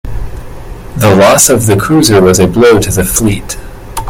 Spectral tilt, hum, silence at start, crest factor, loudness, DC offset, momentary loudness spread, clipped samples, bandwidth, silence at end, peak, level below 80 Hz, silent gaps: -4.5 dB/octave; none; 0.05 s; 8 dB; -7 LUFS; under 0.1%; 20 LU; 0.7%; over 20 kHz; 0 s; 0 dBFS; -24 dBFS; none